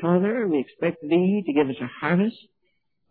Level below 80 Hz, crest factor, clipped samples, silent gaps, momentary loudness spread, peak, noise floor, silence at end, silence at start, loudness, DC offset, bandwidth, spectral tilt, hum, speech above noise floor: -72 dBFS; 16 dB; under 0.1%; none; 6 LU; -8 dBFS; -74 dBFS; 0.75 s; 0 s; -24 LUFS; under 0.1%; 4.5 kHz; -11.5 dB/octave; none; 52 dB